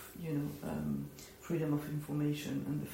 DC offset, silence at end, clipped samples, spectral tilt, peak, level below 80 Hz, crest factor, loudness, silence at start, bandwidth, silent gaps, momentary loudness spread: under 0.1%; 0 s; under 0.1%; -7 dB/octave; -22 dBFS; -62 dBFS; 16 dB; -38 LUFS; 0 s; 16 kHz; none; 5 LU